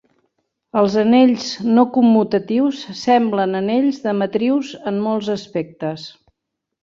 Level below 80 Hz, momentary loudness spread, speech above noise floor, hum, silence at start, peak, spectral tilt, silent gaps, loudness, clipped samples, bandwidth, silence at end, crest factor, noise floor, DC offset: -62 dBFS; 12 LU; 62 dB; none; 0.75 s; -2 dBFS; -6 dB/octave; none; -17 LUFS; under 0.1%; 7.4 kHz; 0.75 s; 16 dB; -79 dBFS; under 0.1%